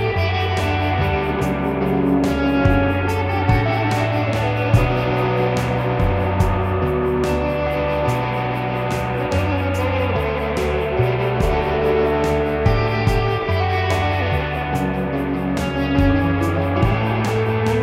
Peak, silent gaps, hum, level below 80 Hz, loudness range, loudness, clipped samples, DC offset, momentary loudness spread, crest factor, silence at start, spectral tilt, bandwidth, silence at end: -2 dBFS; none; none; -30 dBFS; 2 LU; -19 LUFS; under 0.1%; under 0.1%; 4 LU; 16 dB; 0 s; -7 dB/octave; 15.5 kHz; 0 s